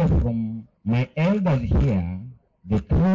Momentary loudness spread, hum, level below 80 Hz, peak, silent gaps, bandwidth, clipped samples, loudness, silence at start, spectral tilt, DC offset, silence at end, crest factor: 11 LU; none; -30 dBFS; -14 dBFS; none; 7.4 kHz; under 0.1%; -23 LUFS; 0 s; -9.5 dB/octave; under 0.1%; 0 s; 6 dB